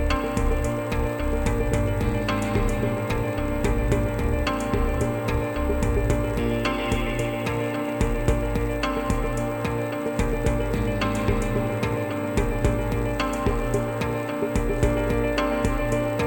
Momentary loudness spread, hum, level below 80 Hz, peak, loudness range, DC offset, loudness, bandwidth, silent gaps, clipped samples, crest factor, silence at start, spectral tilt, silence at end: 3 LU; none; -30 dBFS; -8 dBFS; 1 LU; under 0.1%; -25 LUFS; 17 kHz; none; under 0.1%; 16 dB; 0 s; -6.5 dB/octave; 0 s